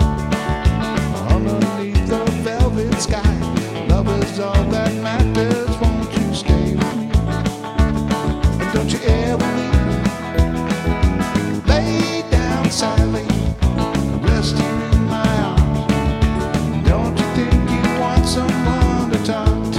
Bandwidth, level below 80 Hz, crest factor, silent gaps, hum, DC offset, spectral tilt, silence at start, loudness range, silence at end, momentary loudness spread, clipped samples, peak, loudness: 14.5 kHz; -22 dBFS; 16 dB; none; none; under 0.1%; -6 dB/octave; 0 s; 1 LU; 0 s; 3 LU; under 0.1%; 0 dBFS; -18 LUFS